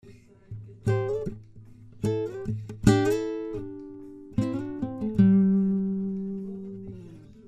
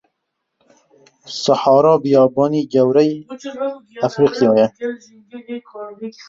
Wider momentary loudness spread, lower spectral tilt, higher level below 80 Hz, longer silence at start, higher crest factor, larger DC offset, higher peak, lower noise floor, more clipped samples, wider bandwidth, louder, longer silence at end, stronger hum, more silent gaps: first, 22 LU vs 19 LU; first, -8 dB/octave vs -6.5 dB/octave; first, -48 dBFS vs -62 dBFS; second, 0.05 s vs 1.25 s; first, 24 dB vs 16 dB; neither; about the same, -2 dBFS vs -2 dBFS; second, -49 dBFS vs -75 dBFS; neither; first, 13 kHz vs 7.8 kHz; second, -27 LUFS vs -16 LUFS; second, 0 s vs 0.2 s; neither; neither